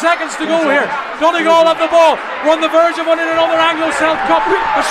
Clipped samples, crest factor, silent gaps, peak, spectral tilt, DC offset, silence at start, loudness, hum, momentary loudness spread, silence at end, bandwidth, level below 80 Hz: under 0.1%; 12 dB; none; 0 dBFS; -3 dB/octave; under 0.1%; 0 s; -12 LUFS; none; 5 LU; 0 s; 13 kHz; -48 dBFS